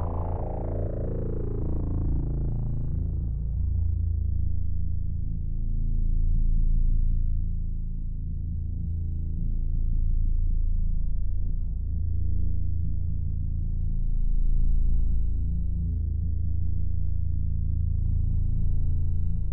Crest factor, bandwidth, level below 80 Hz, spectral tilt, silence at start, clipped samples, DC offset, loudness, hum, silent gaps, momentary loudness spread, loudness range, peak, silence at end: 10 dB; 1.4 kHz; -26 dBFS; -14.5 dB/octave; 0 s; under 0.1%; under 0.1%; -30 LUFS; none; none; 4 LU; 2 LU; -14 dBFS; 0 s